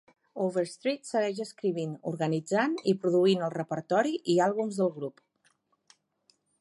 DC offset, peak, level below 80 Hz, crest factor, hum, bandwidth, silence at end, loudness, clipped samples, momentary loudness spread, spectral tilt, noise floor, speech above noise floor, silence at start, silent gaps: under 0.1%; -12 dBFS; -80 dBFS; 18 dB; none; 11.5 kHz; 1.5 s; -29 LUFS; under 0.1%; 9 LU; -6 dB/octave; -71 dBFS; 42 dB; 0.35 s; none